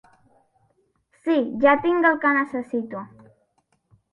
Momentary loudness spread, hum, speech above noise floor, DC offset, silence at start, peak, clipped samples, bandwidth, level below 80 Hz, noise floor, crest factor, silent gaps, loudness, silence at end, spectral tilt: 16 LU; none; 47 dB; under 0.1%; 1.25 s; -4 dBFS; under 0.1%; 5.6 kHz; -66 dBFS; -68 dBFS; 20 dB; none; -21 LUFS; 1.05 s; -7 dB/octave